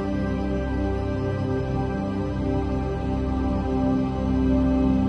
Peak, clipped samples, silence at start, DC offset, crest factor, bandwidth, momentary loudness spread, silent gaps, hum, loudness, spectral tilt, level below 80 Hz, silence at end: -10 dBFS; under 0.1%; 0 s; under 0.1%; 12 dB; 8.2 kHz; 5 LU; none; none; -25 LUFS; -9 dB/octave; -32 dBFS; 0 s